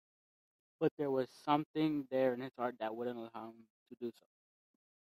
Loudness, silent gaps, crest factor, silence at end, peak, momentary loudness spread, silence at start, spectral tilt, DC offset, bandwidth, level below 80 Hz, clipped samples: -38 LUFS; 0.91-0.97 s, 1.66-1.74 s, 3.70-3.86 s; 22 dB; 0.9 s; -16 dBFS; 12 LU; 0.8 s; -7.5 dB/octave; under 0.1%; 12.5 kHz; -84 dBFS; under 0.1%